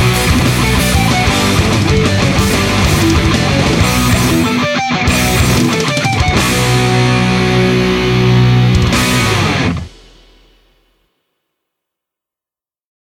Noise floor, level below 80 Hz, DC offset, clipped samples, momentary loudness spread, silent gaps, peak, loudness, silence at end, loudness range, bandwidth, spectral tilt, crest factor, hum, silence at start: under -90 dBFS; -24 dBFS; under 0.1%; under 0.1%; 2 LU; none; 0 dBFS; -11 LUFS; 3.3 s; 5 LU; 17.5 kHz; -5 dB/octave; 12 dB; none; 0 s